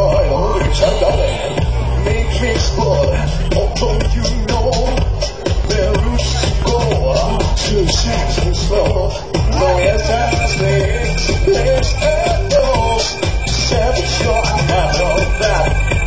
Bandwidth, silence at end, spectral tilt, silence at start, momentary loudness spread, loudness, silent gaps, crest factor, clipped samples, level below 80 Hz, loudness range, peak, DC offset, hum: 8 kHz; 0 s; -5 dB/octave; 0 s; 4 LU; -15 LUFS; none; 12 dB; under 0.1%; -18 dBFS; 2 LU; 0 dBFS; 2%; none